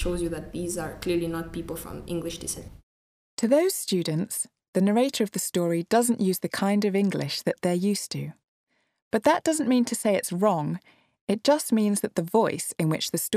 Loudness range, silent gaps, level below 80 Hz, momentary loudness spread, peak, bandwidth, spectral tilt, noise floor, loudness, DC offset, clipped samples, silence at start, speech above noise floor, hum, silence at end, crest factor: 4 LU; 2.83-3.37 s, 4.68-4.73 s, 8.48-8.67 s, 9.02-9.11 s, 11.21-11.27 s; -50 dBFS; 11 LU; -8 dBFS; 15.5 kHz; -5 dB/octave; under -90 dBFS; -26 LUFS; under 0.1%; under 0.1%; 0 s; over 65 dB; none; 0 s; 18 dB